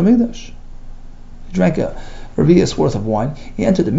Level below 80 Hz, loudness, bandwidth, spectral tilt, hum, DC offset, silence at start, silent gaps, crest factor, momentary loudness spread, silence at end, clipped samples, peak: -30 dBFS; -17 LUFS; 7.8 kHz; -7.5 dB/octave; 60 Hz at -30 dBFS; under 0.1%; 0 s; none; 16 dB; 13 LU; 0 s; under 0.1%; 0 dBFS